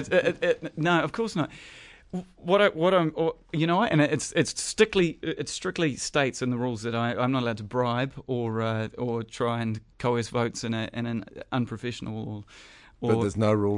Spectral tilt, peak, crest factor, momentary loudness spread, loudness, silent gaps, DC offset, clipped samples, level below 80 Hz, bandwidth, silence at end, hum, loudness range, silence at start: -5 dB/octave; -6 dBFS; 20 dB; 11 LU; -27 LUFS; none; under 0.1%; under 0.1%; -58 dBFS; 11.5 kHz; 0 s; none; 6 LU; 0 s